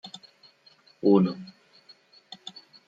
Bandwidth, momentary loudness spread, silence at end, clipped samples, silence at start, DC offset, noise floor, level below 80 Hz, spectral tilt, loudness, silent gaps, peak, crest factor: 7.8 kHz; 25 LU; 0.35 s; under 0.1%; 0.05 s; under 0.1%; -59 dBFS; -74 dBFS; -8.5 dB/octave; -23 LUFS; none; -8 dBFS; 22 dB